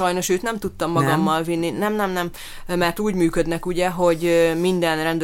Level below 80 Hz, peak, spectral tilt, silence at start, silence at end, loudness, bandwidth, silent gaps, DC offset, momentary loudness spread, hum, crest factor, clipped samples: -40 dBFS; -4 dBFS; -5 dB/octave; 0 s; 0 s; -21 LUFS; 17 kHz; none; under 0.1%; 8 LU; none; 16 dB; under 0.1%